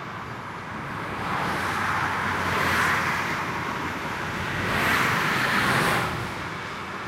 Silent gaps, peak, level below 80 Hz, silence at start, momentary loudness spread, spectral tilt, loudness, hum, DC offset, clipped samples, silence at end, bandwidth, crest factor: none; -10 dBFS; -48 dBFS; 0 s; 11 LU; -4 dB/octave; -25 LUFS; none; under 0.1%; under 0.1%; 0 s; 16 kHz; 16 dB